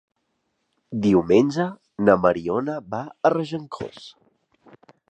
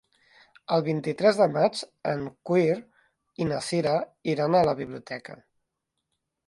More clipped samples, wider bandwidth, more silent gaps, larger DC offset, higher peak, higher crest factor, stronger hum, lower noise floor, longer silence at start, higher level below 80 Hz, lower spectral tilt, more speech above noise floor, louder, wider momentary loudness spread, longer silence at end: neither; second, 9 kHz vs 11.5 kHz; neither; neither; first, -2 dBFS vs -6 dBFS; about the same, 22 dB vs 20 dB; neither; second, -74 dBFS vs -82 dBFS; first, 0.9 s vs 0.7 s; first, -56 dBFS vs -64 dBFS; first, -7.5 dB/octave vs -6 dB/octave; second, 52 dB vs 56 dB; first, -22 LUFS vs -26 LUFS; first, 17 LU vs 14 LU; about the same, 1 s vs 1.1 s